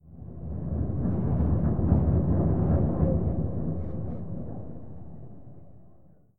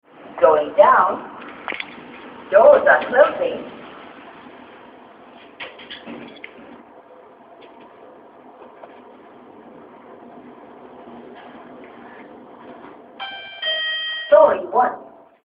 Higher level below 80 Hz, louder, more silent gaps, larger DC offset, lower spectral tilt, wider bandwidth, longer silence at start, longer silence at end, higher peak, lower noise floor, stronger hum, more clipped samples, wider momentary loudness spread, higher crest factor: first, -34 dBFS vs -64 dBFS; second, -27 LUFS vs -16 LUFS; neither; first, 1% vs under 0.1%; first, -14.5 dB/octave vs -7 dB/octave; second, 2.3 kHz vs 5.2 kHz; second, 0 s vs 0.3 s; second, 0 s vs 0.4 s; second, -8 dBFS vs 0 dBFS; first, -56 dBFS vs -46 dBFS; neither; neither; second, 20 LU vs 27 LU; about the same, 20 dB vs 20 dB